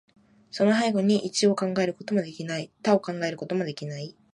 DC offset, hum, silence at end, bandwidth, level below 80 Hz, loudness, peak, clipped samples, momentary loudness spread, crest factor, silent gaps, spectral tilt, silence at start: under 0.1%; none; 0.25 s; 11.5 kHz; -72 dBFS; -26 LUFS; -8 dBFS; under 0.1%; 11 LU; 20 dB; none; -5 dB/octave; 0.55 s